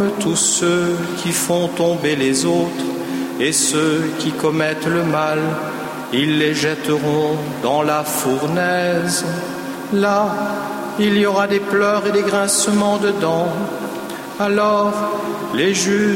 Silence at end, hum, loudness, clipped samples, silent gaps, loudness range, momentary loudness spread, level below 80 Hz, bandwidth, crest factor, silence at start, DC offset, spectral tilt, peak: 0 s; none; -18 LUFS; under 0.1%; none; 2 LU; 8 LU; -58 dBFS; 16.5 kHz; 14 dB; 0 s; under 0.1%; -4 dB/octave; -4 dBFS